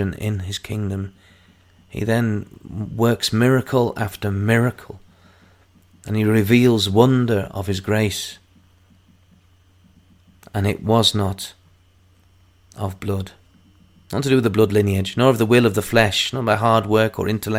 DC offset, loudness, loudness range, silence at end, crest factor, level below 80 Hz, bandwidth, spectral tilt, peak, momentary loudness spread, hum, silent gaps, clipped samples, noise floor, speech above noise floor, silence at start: under 0.1%; -19 LUFS; 8 LU; 0 s; 20 dB; -50 dBFS; 16.5 kHz; -5.5 dB/octave; 0 dBFS; 14 LU; none; none; under 0.1%; -55 dBFS; 36 dB; 0 s